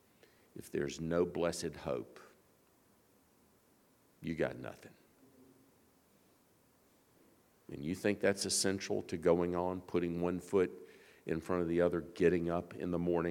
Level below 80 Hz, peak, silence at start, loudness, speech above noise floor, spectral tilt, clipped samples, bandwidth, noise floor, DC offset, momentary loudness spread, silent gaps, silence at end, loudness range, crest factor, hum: -64 dBFS; -16 dBFS; 0.55 s; -36 LUFS; 34 dB; -5 dB/octave; under 0.1%; 18 kHz; -69 dBFS; under 0.1%; 17 LU; none; 0 s; 12 LU; 22 dB; none